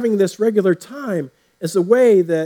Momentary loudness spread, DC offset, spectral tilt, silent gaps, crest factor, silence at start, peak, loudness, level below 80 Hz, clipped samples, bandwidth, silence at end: 13 LU; under 0.1%; -6.5 dB/octave; none; 16 dB; 0 s; -2 dBFS; -17 LUFS; -76 dBFS; under 0.1%; 18 kHz; 0 s